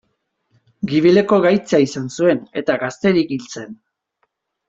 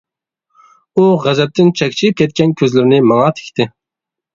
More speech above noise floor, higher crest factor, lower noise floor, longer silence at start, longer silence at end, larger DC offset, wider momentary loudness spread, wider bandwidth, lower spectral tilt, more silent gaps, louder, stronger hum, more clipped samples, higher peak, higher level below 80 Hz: second, 53 dB vs 72 dB; about the same, 16 dB vs 14 dB; second, -70 dBFS vs -84 dBFS; about the same, 0.85 s vs 0.95 s; first, 0.95 s vs 0.65 s; neither; first, 15 LU vs 9 LU; about the same, 7.8 kHz vs 7.6 kHz; about the same, -6 dB/octave vs -6.5 dB/octave; neither; second, -17 LUFS vs -13 LUFS; neither; neither; about the same, -2 dBFS vs 0 dBFS; about the same, -58 dBFS vs -54 dBFS